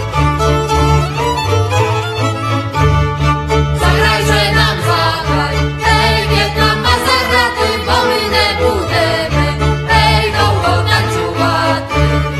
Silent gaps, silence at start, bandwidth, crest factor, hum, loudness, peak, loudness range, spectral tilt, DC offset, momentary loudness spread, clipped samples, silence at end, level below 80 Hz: none; 0 s; 14 kHz; 12 dB; none; -13 LUFS; 0 dBFS; 2 LU; -5 dB/octave; under 0.1%; 4 LU; under 0.1%; 0 s; -22 dBFS